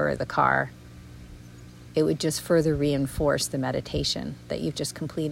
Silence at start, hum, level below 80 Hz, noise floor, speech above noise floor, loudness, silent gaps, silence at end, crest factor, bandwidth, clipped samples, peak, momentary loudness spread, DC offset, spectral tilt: 0 s; none; -46 dBFS; -45 dBFS; 20 dB; -26 LUFS; none; 0 s; 18 dB; 16.5 kHz; under 0.1%; -8 dBFS; 23 LU; under 0.1%; -5 dB/octave